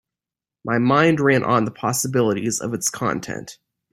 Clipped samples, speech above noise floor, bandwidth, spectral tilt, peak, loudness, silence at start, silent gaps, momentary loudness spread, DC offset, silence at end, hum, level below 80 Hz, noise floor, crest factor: under 0.1%; 69 dB; 16.5 kHz; -4.5 dB/octave; -2 dBFS; -20 LUFS; 0.65 s; none; 15 LU; under 0.1%; 0.4 s; none; -58 dBFS; -89 dBFS; 18 dB